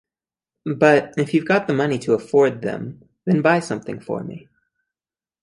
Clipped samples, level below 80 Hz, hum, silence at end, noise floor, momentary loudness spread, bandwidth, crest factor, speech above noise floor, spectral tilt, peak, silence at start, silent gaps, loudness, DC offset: under 0.1%; -62 dBFS; none; 1.05 s; under -90 dBFS; 16 LU; 11.5 kHz; 18 dB; over 71 dB; -6.5 dB/octave; -2 dBFS; 0.65 s; none; -20 LUFS; under 0.1%